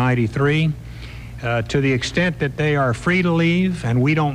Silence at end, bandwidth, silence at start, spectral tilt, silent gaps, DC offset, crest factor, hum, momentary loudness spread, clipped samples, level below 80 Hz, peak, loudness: 0 s; 11 kHz; 0 s; -6.5 dB/octave; none; under 0.1%; 12 dB; none; 12 LU; under 0.1%; -40 dBFS; -6 dBFS; -19 LUFS